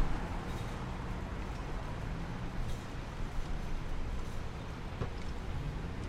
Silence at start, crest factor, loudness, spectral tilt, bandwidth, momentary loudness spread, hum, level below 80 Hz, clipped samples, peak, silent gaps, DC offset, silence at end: 0 s; 16 dB; -41 LUFS; -6 dB/octave; 12.5 kHz; 3 LU; none; -40 dBFS; under 0.1%; -20 dBFS; none; under 0.1%; 0 s